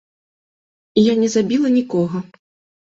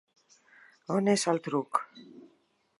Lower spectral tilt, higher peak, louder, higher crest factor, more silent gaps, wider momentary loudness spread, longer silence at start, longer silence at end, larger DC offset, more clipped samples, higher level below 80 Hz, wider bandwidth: first, -6 dB/octave vs -4.5 dB/octave; first, -2 dBFS vs -10 dBFS; first, -17 LUFS vs -29 LUFS; second, 16 dB vs 22 dB; neither; second, 8 LU vs 22 LU; about the same, 0.95 s vs 0.9 s; about the same, 0.65 s vs 0.6 s; neither; neither; first, -58 dBFS vs -84 dBFS; second, 7.8 kHz vs 11.5 kHz